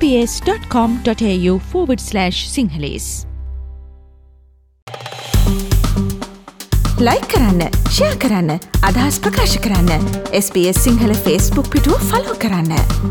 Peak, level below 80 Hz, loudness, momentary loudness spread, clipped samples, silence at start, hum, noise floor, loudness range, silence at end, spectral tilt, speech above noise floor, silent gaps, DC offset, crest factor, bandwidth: -2 dBFS; -22 dBFS; -16 LUFS; 13 LU; under 0.1%; 0 s; none; -49 dBFS; 7 LU; 0 s; -5 dB/octave; 34 dB; 4.82-4.87 s; under 0.1%; 14 dB; 19.5 kHz